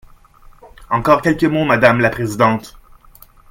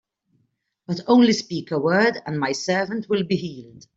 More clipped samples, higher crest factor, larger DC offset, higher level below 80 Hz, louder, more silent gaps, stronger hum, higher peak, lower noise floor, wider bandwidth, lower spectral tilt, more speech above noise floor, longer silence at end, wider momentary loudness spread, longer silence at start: neither; about the same, 16 dB vs 18 dB; neither; first, -42 dBFS vs -64 dBFS; first, -15 LUFS vs -21 LUFS; neither; neither; first, 0 dBFS vs -4 dBFS; second, -45 dBFS vs -70 dBFS; first, 17 kHz vs 7.8 kHz; first, -6.5 dB/octave vs -5 dB/octave; second, 31 dB vs 49 dB; first, 0.8 s vs 0.2 s; second, 7 LU vs 14 LU; second, 0.65 s vs 0.9 s